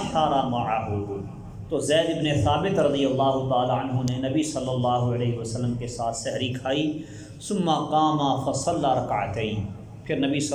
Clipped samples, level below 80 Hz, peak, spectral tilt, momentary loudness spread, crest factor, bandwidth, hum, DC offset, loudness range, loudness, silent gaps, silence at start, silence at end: under 0.1%; -48 dBFS; -10 dBFS; -5.5 dB/octave; 9 LU; 16 dB; 12.5 kHz; none; under 0.1%; 3 LU; -25 LUFS; none; 0 s; 0 s